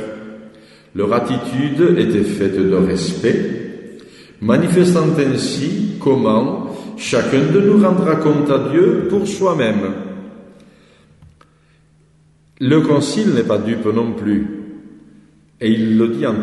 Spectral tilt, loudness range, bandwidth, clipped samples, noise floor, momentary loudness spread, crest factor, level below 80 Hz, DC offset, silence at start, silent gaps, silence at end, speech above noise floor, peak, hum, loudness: -6.5 dB/octave; 6 LU; 12 kHz; under 0.1%; -53 dBFS; 15 LU; 16 dB; -52 dBFS; under 0.1%; 0 s; none; 0 s; 38 dB; -2 dBFS; none; -16 LUFS